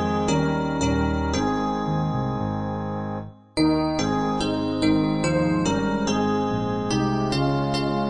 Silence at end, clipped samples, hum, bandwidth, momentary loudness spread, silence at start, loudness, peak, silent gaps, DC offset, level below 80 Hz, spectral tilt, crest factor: 0 s; under 0.1%; none; 10 kHz; 6 LU; 0 s; -24 LUFS; -8 dBFS; none; 0.4%; -40 dBFS; -6 dB/octave; 14 dB